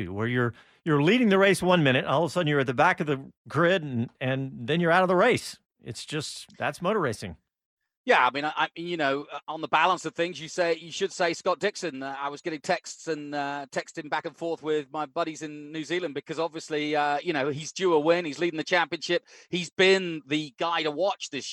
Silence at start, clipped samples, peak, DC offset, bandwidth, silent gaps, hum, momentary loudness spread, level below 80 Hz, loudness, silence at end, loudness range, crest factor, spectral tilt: 0 s; under 0.1%; -8 dBFS; under 0.1%; 14 kHz; 3.37-3.45 s, 7.65-7.77 s, 7.97-8.04 s, 19.72-19.76 s; none; 12 LU; -66 dBFS; -26 LUFS; 0 s; 8 LU; 20 dB; -5 dB/octave